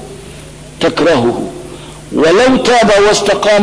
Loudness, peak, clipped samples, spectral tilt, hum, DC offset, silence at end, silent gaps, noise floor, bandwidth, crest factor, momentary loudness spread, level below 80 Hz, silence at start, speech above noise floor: -10 LUFS; -2 dBFS; under 0.1%; -4 dB/octave; none; under 0.1%; 0 s; none; -31 dBFS; 11 kHz; 10 dB; 22 LU; -36 dBFS; 0 s; 22 dB